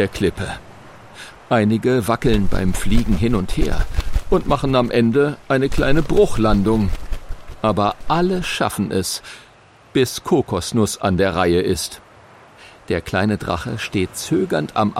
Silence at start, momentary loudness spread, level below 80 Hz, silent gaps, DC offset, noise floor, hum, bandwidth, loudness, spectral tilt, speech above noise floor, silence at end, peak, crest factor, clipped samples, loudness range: 0 s; 12 LU; -28 dBFS; none; under 0.1%; -48 dBFS; none; 15.5 kHz; -19 LUFS; -5.5 dB/octave; 31 dB; 0 s; -2 dBFS; 16 dB; under 0.1%; 3 LU